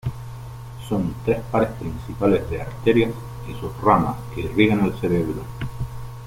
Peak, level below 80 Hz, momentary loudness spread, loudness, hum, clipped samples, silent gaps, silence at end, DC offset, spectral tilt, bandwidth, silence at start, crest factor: -2 dBFS; -40 dBFS; 15 LU; -22 LUFS; none; under 0.1%; none; 0 s; under 0.1%; -7.5 dB/octave; 16.5 kHz; 0.05 s; 20 dB